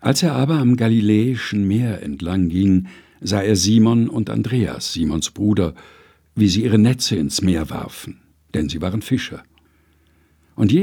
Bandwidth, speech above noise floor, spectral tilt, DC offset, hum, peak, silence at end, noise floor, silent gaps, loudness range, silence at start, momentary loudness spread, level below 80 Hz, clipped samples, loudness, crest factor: 17.5 kHz; 39 dB; -5.5 dB/octave; under 0.1%; none; 0 dBFS; 0 s; -57 dBFS; none; 5 LU; 0 s; 14 LU; -44 dBFS; under 0.1%; -19 LUFS; 18 dB